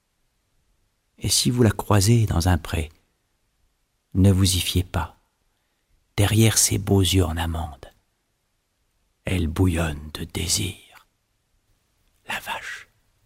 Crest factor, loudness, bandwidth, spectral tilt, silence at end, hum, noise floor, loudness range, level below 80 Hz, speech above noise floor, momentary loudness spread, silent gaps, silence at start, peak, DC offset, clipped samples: 20 dB; -22 LUFS; 16 kHz; -4.5 dB/octave; 0.45 s; none; -71 dBFS; 6 LU; -38 dBFS; 51 dB; 15 LU; none; 1.2 s; -4 dBFS; under 0.1%; under 0.1%